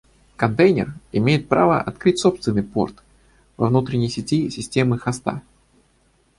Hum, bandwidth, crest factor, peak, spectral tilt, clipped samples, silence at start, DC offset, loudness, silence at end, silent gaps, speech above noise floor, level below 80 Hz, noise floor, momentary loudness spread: none; 11.5 kHz; 18 dB; -2 dBFS; -6.5 dB/octave; under 0.1%; 0.4 s; under 0.1%; -20 LUFS; 1 s; none; 41 dB; -50 dBFS; -60 dBFS; 8 LU